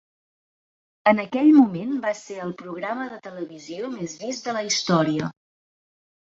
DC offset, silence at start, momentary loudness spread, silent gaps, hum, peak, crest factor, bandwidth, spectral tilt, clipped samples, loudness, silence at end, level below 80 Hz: under 0.1%; 1.05 s; 17 LU; none; none; -4 dBFS; 20 dB; 7.8 kHz; -5 dB/octave; under 0.1%; -22 LUFS; 1 s; -68 dBFS